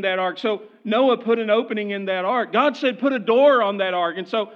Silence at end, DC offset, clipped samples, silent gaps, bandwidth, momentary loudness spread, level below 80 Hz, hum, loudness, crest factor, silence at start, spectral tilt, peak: 0 s; under 0.1%; under 0.1%; none; 7 kHz; 9 LU; under -90 dBFS; none; -20 LUFS; 16 dB; 0 s; -6 dB/octave; -4 dBFS